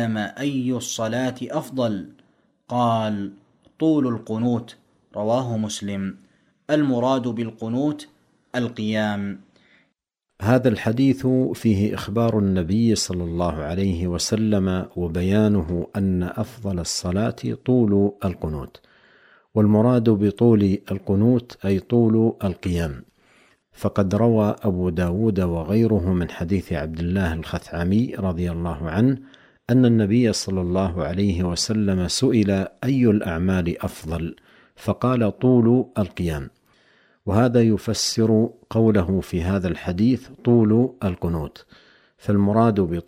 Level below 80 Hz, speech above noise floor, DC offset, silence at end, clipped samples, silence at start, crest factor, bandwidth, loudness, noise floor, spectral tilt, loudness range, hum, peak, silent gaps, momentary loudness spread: -44 dBFS; 55 dB; under 0.1%; 0.05 s; under 0.1%; 0 s; 18 dB; 15.5 kHz; -22 LUFS; -76 dBFS; -6.5 dB/octave; 5 LU; none; -4 dBFS; none; 11 LU